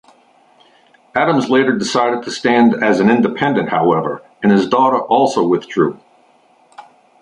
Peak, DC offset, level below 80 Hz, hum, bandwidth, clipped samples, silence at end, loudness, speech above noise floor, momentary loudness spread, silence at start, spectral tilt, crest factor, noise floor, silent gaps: 0 dBFS; under 0.1%; -58 dBFS; none; 11 kHz; under 0.1%; 0.4 s; -15 LUFS; 38 dB; 6 LU; 1.15 s; -5.5 dB/octave; 16 dB; -52 dBFS; none